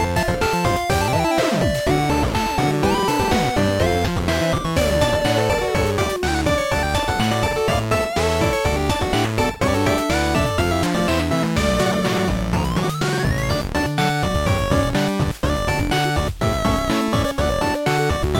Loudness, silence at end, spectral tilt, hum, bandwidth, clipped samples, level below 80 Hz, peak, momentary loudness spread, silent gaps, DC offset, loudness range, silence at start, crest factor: -20 LUFS; 0 s; -5 dB/octave; none; 17 kHz; under 0.1%; -30 dBFS; -4 dBFS; 2 LU; none; under 0.1%; 1 LU; 0 s; 14 dB